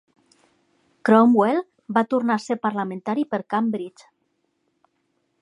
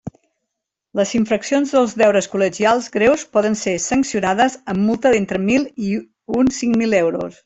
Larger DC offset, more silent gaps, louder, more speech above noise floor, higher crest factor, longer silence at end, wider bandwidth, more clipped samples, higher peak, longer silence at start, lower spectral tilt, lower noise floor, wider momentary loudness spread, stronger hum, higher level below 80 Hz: neither; neither; second, -21 LUFS vs -18 LUFS; second, 51 dB vs 63 dB; first, 20 dB vs 14 dB; first, 1.5 s vs 0.15 s; first, 10.5 kHz vs 8.4 kHz; neither; about the same, -2 dBFS vs -2 dBFS; first, 1.05 s vs 0.05 s; first, -7 dB/octave vs -4.5 dB/octave; second, -71 dBFS vs -80 dBFS; first, 12 LU vs 7 LU; neither; second, -76 dBFS vs -52 dBFS